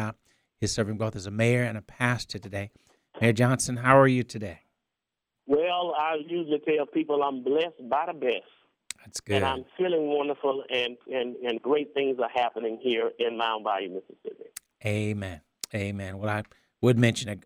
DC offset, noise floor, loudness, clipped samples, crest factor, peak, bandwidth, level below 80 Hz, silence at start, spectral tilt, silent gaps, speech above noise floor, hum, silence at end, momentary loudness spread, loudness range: under 0.1%; -86 dBFS; -27 LUFS; under 0.1%; 24 dB; -4 dBFS; 16 kHz; -60 dBFS; 0 s; -5.5 dB/octave; none; 59 dB; none; 0.05 s; 14 LU; 6 LU